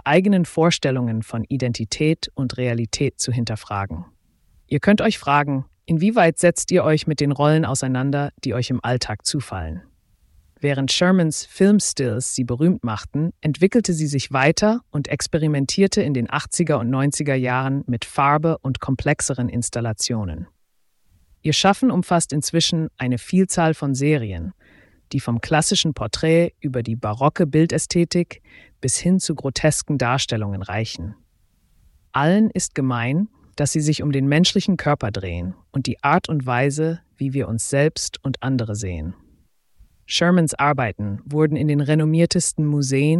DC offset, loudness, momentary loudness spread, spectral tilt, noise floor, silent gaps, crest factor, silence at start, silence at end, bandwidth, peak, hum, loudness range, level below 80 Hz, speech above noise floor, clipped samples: under 0.1%; -20 LUFS; 9 LU; -5 dB/octave; -63 dBFS; none; 18 dB; 0.05 s; 0 s; 12 kHz; -2 dBFS; none; 4 LU; -46 dBFS; 43 dB; under 0.1%